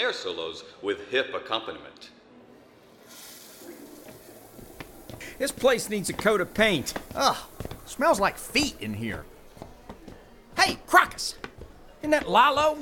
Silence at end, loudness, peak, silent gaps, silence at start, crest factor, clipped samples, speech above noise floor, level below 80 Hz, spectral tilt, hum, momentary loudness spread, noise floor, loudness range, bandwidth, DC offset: 0 s; -25 LUFS; -2 dBFS; none; 0 s; 26 dB; under 0.1%; 28 dB; -52 dBFS; -3 dB/octave; none; 25 LU; -53 dBFS; 14 LU; 18 kHz; under 0.1%